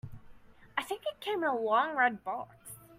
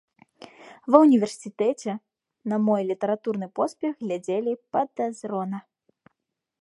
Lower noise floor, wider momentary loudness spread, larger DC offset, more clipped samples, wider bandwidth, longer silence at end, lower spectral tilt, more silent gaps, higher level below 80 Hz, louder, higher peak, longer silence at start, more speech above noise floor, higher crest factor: second, -54 dBFS vs -81 dBFS; about the same, 16 LU vs 15 LU; neither; neither; first, 16 kHz vs 11.5 kHz; second, 0 s vs 1 s; second, -4 dB/octave vs -7 dB/octave; neither; first, -64 dBFS vs -78 dBFS; second, -32 LUFS vs -25 LUFS; second, -14 dBFS vs -2 dBFS; second, 0.05 s vs 0.65 s; second, 23 dB vs 57 dB; about the same, 20 dB vs 24 dB